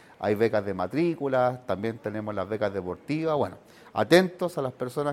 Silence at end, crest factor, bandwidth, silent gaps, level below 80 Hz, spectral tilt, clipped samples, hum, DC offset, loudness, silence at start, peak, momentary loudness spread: 0 s; 22 dB; 15.5 kHz; none; -64 dBFS; -6.5 dB/octave; under 0.1%; none; under 0.1%; -27 LUFS; 0.2 s; -4 dBFS; 11 LU